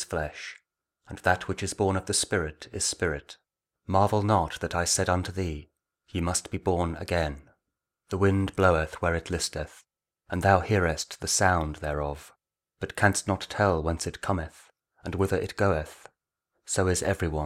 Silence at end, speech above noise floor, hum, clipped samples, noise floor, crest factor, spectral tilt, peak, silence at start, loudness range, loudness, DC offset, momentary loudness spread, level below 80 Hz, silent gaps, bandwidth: 0 s; 58 dB; none; under 0.1%; -85 dBFS; 22 dB; -4.5 dB/octave; -6 dBFS; 0 s; 3 LU; -27 LUFS; under 0.1%; 13 LU; -44 dBFS; none; 15.5 kHz